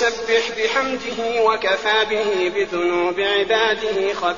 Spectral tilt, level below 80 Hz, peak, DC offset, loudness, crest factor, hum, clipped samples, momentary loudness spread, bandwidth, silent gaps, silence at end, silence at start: 0 dB/octave; -54 dBFS; -4 dBFS; 0.4%; -19 LUFS; 14 dB; none; under 0.1%; 4 LU; 7.4 kHz; none; 0 s; 0 s